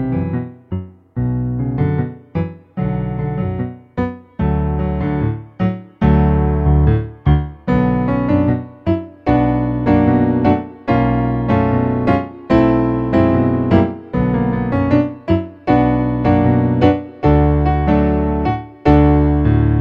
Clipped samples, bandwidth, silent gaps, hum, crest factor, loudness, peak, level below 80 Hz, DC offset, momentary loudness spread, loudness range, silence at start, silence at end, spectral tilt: under 0.1%; 5.4 kHz; none; none; 16 dB; -16 LUFS; 0 dBFS; -24 dBFS; under 0.1%; 9 LU; 6 LU; 0 s; 0 s; -10.5 dB/octave